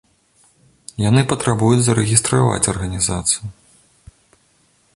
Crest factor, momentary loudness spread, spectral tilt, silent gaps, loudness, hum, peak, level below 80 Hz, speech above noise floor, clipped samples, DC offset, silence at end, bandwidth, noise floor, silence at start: 20 dB; 8 LU; -4.5 dB/octave; none; -17 LUFS; none; 0 dBFS; -40 dBFS; 42 dB; under 0.1%; under 0.1%; 1.45 s; 11.5 kHz; -58 dBFS; 1 s